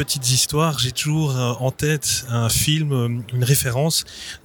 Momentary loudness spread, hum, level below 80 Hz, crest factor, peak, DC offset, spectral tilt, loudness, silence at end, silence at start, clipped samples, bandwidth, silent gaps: 5 LU; none; -44 dBFS; 18 dB; -4 dBFS; under 0.1%; -4 dB/octave; -20 LUFS; 0.1 s; 0 s; under 0.1%; 19.5 kHz; none